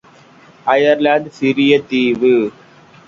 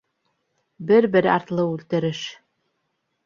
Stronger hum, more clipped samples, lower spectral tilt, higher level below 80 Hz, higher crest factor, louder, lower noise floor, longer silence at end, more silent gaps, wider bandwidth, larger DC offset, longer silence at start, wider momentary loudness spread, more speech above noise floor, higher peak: neither; neither; about the same, -6 dB/octave vs -6.5 dB/octave; first, -58 dBFS vs -64 dBFS; about the same, 16 dB vs 20 dB; first, -14 LUFS vs -20 LUFS; second, -45 dBFS vs -74 dBFS; second, 0.6 s vs 0.9 s; neither; about the same, 7.4 kHz vs 7.4 kHz; neither; second, 0.65 s vs 0.8 s; second, 5 LU vs 16 LU; second, 31 dB vs 54 dB; first, 0 dBFS vs -4 dBFS